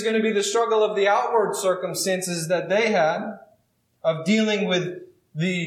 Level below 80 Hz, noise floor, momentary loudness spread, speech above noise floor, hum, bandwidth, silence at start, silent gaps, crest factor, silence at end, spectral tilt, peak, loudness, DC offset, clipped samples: -80 dBFS; -66 dBFS; 8 LU; 44 dB; none; 16.5 kHz; 0 s; none; 14 dB; 0 s; -4 dB/octave; -8 dBFS; -22 LUFS; under 0.1%; under 0.1%